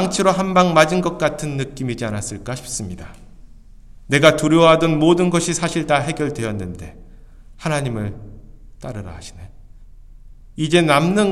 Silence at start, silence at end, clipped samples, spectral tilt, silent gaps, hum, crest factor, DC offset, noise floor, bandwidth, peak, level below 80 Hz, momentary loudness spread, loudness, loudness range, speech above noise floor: 0 s; 0 s; under 0.1%; -5 dB/octave; none; none; 20 dB; under 0.1%; -41 dBFS; 14.5 kHz; 0 dBFS; -42 dBFS; 20 LU; -18 LUFS; 13 LU; 23 dB